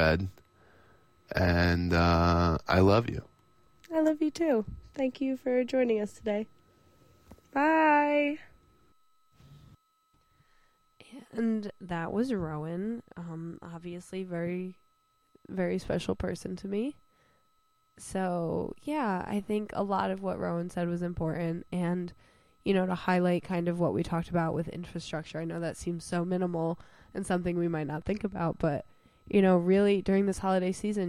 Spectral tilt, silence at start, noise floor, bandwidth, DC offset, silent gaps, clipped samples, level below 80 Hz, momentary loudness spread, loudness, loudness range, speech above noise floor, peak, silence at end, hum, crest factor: -7 dB/octave; 0 s; -72 dBFS; 13.5 kHz; under 0.1%; none; under 0.1%; -50 dBFS; 14 LU; -30 LUFS; 9 LU; 43 dB; -12 dBFS; 0 s; none; 20 dB